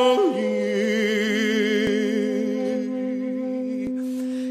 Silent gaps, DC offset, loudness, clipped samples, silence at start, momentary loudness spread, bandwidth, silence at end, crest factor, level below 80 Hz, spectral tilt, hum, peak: none; under 0.1%; -23 LUFS; under 0.1%; 0 s; 6 LU; 15 kHz; 0 s; 16 dB; -60 dBFS; -5 dB/octave; none; -6 dBFS